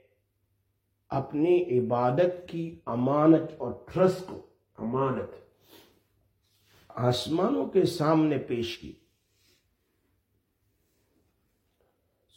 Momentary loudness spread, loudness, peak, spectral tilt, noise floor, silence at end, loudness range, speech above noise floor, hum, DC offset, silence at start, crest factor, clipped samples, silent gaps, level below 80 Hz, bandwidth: 14 LU; -27 LUFS; -10 dBFS; -7 dB/octave; -75 dBFS; 3.45 s; 7 LU; 49 dB; none; under 0.1%; 1.1 s; 20 dB; under 0.1%; none; -66 dBFS; 16.5 kHz